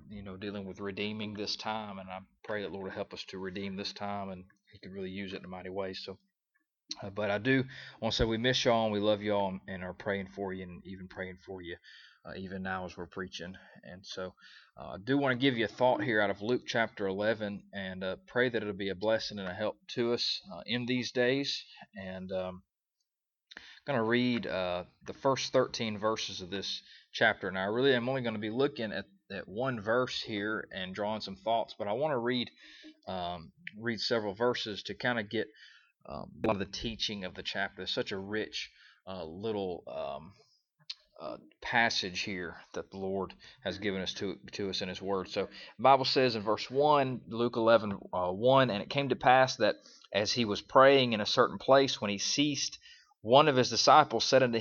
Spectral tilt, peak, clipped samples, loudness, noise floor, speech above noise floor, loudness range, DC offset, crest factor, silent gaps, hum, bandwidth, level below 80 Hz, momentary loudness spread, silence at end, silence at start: -4.5 dB/octave; -8 dBFS; under 0.1%; -31 LUFS; -86 dBFS; 55 dB; 13 LU; under 0.1%; 24 dB; none; none; 7.4 kHz; -60 dBFS; 18 LU; 0 s; 0.05 s